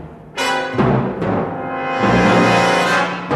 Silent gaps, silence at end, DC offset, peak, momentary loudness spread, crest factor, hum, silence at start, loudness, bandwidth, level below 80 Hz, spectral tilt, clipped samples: none; 0 s; under 0.1%; -2 dBFS; 9 LU; 14 dB; none; 0 s; -16 LUFS; 13 kHz; -42 dBFS; -5.5 dB/octave; under 0.1%